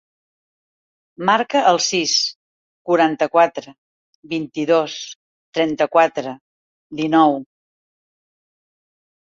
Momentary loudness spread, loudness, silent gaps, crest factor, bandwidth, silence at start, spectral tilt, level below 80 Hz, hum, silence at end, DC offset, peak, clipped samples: 16 LU; -18 LUFS; 2.35-2.85 s, 3.78-4.23 s, 5.15-5.53 s, 6.41-6.90 s; 20 dB; 7.8 kHz; 1.2 s; -3 dB/octave; -66 dBFS; none; 1.85 s; under 0.1%; -2 dBFS; under 0.1%